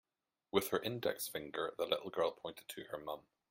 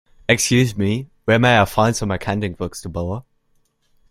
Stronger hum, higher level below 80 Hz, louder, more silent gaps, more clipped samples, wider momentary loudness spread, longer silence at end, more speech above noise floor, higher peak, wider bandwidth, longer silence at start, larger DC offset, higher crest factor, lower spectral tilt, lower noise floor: neither; second, -76 dBFS vs -44 dBFS; second, -40 LUFS vs -19 LUFS; neither; neither; about the same, 12 LU vs 13 LU; second, 0.3 s vs 0.9 s; second, 21 dB vs 45 dB; second, -16 dBFS vs -2 dBFS; about the same, 16.5 kHz vs 16 kHz; first, 0.55 s vs 0.3 s; neither; first, 24 dB vs 18 dB; about the same, -3.5 dB/octave vs -4.5 dB/octave; about the same, -61 dBFS vs -63 dBFS